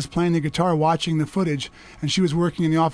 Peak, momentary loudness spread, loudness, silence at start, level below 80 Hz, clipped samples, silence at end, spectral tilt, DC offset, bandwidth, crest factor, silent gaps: -8 dBFS; 7 LU; -22 LUFS; 0 s; -48 dBFS; under 0.1%; 0 s; -6 dB/octave; under 0.1%; 11 kHz; 14 dB; none